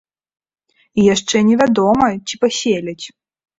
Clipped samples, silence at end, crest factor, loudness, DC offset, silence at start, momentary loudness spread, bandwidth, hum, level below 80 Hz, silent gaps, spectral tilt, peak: under 0.1%; 0.5 s; 16 dB; -15 LUFS; under 0.1%; 0.95 s; 13 LU; 8 kHz; none; -50 dBFS; none; -4.5 dB/octave; -2 dBFS